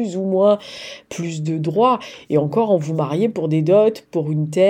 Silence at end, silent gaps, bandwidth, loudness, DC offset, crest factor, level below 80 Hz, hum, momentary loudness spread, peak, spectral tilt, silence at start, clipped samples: 0 s; none; 10 kHz; -19 LUFS; under 0.1%; 14 dB; -66 dBFS; none; 11 LU; -4 dBFS; -7.5 dB/octave; 0 s; under 0.1%